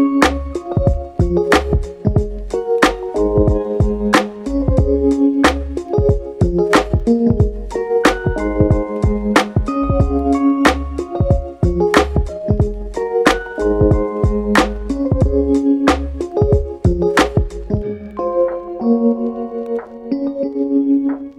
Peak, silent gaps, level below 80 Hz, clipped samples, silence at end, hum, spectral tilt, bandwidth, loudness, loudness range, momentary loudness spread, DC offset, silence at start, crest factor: 0 dBFS; none; -24 dBFS; under 0.1%; 0.05 s; none; -6.5 dB/octave; 14 kHz; -17 LUFS; 2 LU; 8 LU; under 0.1%; 0 s; 16 dB